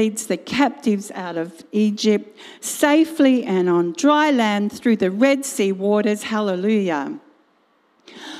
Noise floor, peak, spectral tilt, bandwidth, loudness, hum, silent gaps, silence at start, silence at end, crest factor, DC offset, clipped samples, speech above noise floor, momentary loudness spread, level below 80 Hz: -61 dBFS; -2 dBFS; -5 dB/octave; 15.5 kHz; -19 LUFS; none; none; 0 s; 0 s; 16 dB; under 0.1%; under 0.1%; 42 dB; 11 LU; -66 dBFS